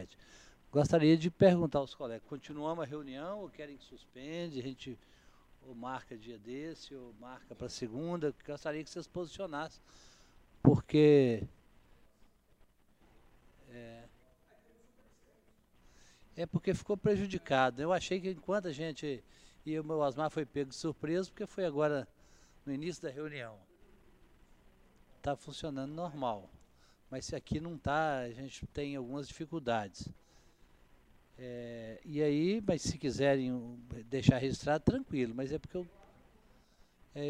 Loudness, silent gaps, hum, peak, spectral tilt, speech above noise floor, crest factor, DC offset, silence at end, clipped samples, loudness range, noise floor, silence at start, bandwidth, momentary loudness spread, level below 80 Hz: -35 LUFS; none; none; -8 dBFS; -6.5 dB/octave; 33 dB; 28 dB; under 0.1%; 0 s; under 0.1%; 13 LU; -67 dBFS; 0 s; 11.5 kHz; 21 LU; -60 dBFS